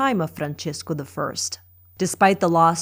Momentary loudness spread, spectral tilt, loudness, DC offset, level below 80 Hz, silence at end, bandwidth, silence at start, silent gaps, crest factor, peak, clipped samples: 12 LU; -4.5 dB/octave; -22 LUFS; under 0.1%; -62 dBFS; 0 s; 16 kHz; 0 s; none; 20 dB; -2 dBFS; under 0.1%